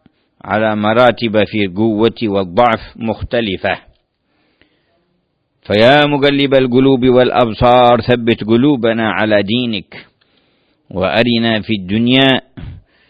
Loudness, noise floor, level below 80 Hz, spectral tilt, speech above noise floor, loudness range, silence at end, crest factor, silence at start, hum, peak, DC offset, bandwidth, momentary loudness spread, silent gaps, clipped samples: -13 LUFS; -64 dBFS; -40 dBFS; -8 dB/octave; 52 dB; 7 LU; 0.3 s; 14 dB; 0.45 s; none; 0 dBFS; under 0.1%; 6.8 kHz; 10 LU; none; under 0.1%